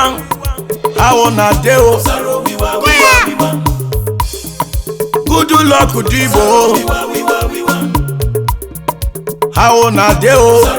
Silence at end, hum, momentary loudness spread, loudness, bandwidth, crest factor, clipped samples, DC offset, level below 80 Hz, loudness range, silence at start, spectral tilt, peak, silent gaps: 0 s; none; 12 LU; -11 LUFS; over 20 kHz; 10 dB; 0.2%; under 0.1%; -22 dBFS; 3 LU; 0 s; -4.5 dB/octave; 0 dBFS; none